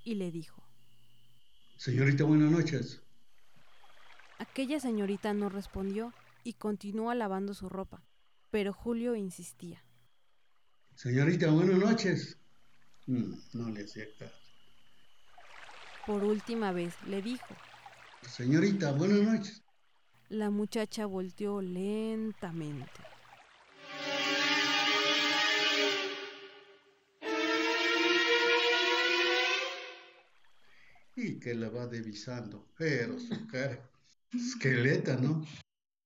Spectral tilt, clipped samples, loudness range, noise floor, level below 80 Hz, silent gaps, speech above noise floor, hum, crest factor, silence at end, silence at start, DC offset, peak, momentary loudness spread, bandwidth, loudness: -5 dB/octave; under 0.1%; 10 LU; -77 dBFS; -66 dBFS; none; 45 dB; none; 18 dB; 0.45 s; 0 s; under 0.1%; -14 dBFS; 20 LU; 16.5 kHz; -31 LUFS